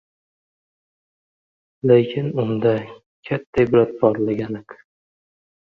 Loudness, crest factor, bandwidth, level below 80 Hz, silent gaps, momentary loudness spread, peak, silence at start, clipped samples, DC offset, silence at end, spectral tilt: -20 LUFS; 20 dB; 6 kHz; -54 dBFS; 3.06-3.23 s, 3.47-3.53 s; 12 LU; -2 dBFS; 1.85 s; under 0.1%; under 0.1%; 0.85 s; -9.5 dB/octave